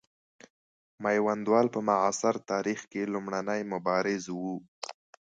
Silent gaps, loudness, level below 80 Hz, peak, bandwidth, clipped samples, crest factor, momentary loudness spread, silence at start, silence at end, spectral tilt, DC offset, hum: 4.68-4.82 s; -29 LUFS; -74 dBFS; -10 dBFS; 9.4 kHz; under 0.1%; 20 dB; 12 LU; 1 s; 0.4 s; -5 dB/octave; under 0.1%; none